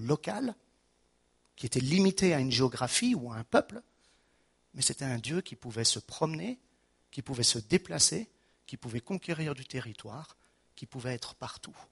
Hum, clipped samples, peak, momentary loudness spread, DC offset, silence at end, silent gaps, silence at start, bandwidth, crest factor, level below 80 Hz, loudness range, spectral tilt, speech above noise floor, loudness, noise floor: none; under 0.1%; -10 dBFS; 20 LU; under 0.1%; 0.1 s; none; 0 s; 11.5 kHz; 24 dB; -64 dBFS; 5 LU; -3.5 dB/octave; 40 dB; -31 LUFS; -71 dBFS